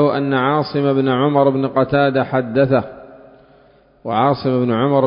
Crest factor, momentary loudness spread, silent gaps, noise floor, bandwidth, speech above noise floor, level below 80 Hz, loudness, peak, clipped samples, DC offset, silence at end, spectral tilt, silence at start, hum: 14 dB; 3 LU; none; -50 dBFS; 5.4 kHz; 35 dB; -52 dBFS; -16 LUFS; -2 dBFS; under 0.1%; under 0.1%; 0 s; -12 dB/octave; 0 s; none